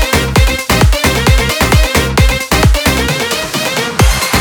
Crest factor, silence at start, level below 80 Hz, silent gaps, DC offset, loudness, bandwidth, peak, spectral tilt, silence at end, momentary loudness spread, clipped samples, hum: 10 dB; 0 s; -16 dBFS; none; under 0.1%; -11 LUFS; over 20 kHz; 0 dBFS; -4 dB/octave; 0 s; 4 LU; under 0.1%; none